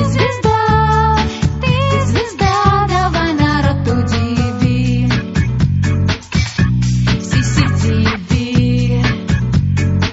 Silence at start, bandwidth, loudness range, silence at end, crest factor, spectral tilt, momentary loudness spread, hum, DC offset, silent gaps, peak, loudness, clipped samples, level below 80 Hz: 0 s; 8 kHz; 2 LU; 0 s; 14 dB; -5.5 dB/octave; 4 LU; none; under 0.1%; none; 0 dBFS; -14 LUFS; under 0.1%; -26 dBFS